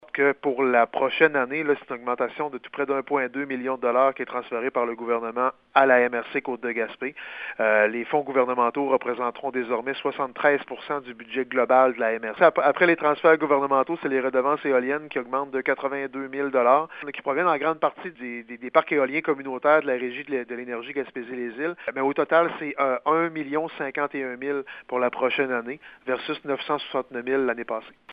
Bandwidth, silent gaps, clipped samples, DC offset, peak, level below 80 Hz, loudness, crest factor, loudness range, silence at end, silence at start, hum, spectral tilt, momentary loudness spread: 5 kHz; none; under 0.1%; under 0.1%; -4 dBFS; -72 dBFS; -24 LUFS; 20 dB; 5 LU; 0 s; 0.15 s; none; -8 dB/octave; 11 LU